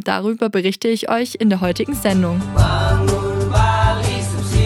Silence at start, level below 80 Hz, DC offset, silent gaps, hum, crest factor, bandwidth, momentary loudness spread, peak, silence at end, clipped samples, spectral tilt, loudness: 0 s; -26 dBFS; under 0.1%; none; none; 14 dB; 15.5 kHz; 4 LU; -2 dBFS; 0 s; under 0.1%; -6 dB/octave; -18 LUFS